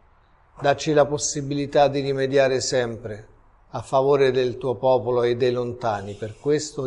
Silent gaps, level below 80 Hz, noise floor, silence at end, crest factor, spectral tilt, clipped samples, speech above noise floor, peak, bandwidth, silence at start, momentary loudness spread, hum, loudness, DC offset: none; -52 dBFS; -56 dBFS; 0 s; 18 dB; -4.5 dB/octave; under 0.1%; 35 dB; -6 dBFS; 11 kHz; 0.6 s; 10 LU; none; -22 LUFS; under 0.1%